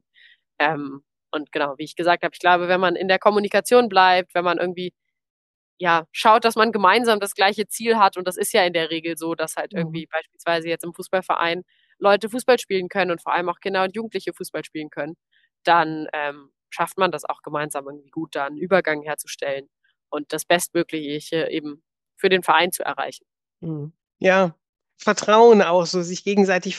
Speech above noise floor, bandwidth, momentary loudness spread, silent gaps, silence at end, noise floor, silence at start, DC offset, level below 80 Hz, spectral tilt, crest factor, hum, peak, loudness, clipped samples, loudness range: 35 dB; 12.5 kHz; 15 LU; 5.30-5.77 s, 24.69-24.73 s; 0 s; -55 dBFS; 0.6 s; under 0.1%; -72 dBFS; -4 dB/octave; 20 dB; none; -2 dBFS; -21 LUFS; under 0.1%; 6 LU